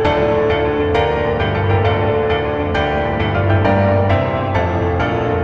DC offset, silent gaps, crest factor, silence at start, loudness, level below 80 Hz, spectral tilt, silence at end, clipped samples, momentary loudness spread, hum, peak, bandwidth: 0.2%; none; 12 dB; 0 s; -16 LUFS; -32 dBFS; -8 dB/octave; 0 s; under 0.1%; 3 LU; none; -2 dBFS; 6.6 kHz